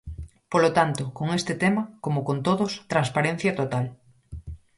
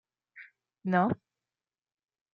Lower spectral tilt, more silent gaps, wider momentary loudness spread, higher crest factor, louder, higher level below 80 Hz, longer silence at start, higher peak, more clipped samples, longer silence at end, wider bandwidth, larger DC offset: second, -6 dB/octave vs -9.5 dB/octave; neither; second, 19 LU vs 24 LU; about the same, 20 dB vs 24 dB; first, -25 LUFS vs -30 LUFS; first, -48 dBFS vs -74 dBFS; second, 0.05 s vs 0.35 s; first, -6 dBFS vs -12 dBFS; neither; second, 0.2 s vs 1.2 s; first, 11.5 kHz vs 5 kHz; neither